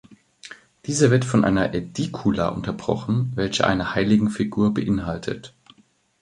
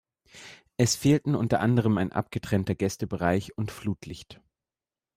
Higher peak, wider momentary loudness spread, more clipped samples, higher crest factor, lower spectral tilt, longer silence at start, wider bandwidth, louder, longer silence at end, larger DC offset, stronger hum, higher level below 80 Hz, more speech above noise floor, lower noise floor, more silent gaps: first, -2 dBFS vs -8 dBFS; second, 13 LU vs 19 LU; neither; about the same, 20 dB vs 18 dB; about the same, -6 dB/octave vs -5.5 dB/octave; second, 0.1 s vs 0.35 s; second, 11 kHz vs 16 kHz; first, -22 LUFS vs -27 LUFS; about the same, 0.75 s vs 0.85 s; neither; neither; first, -46 dBFS vs -56 dBFS; second, 38 dB vs over 64 dB; second, -59 dBFS vs under -90 dBFS; neither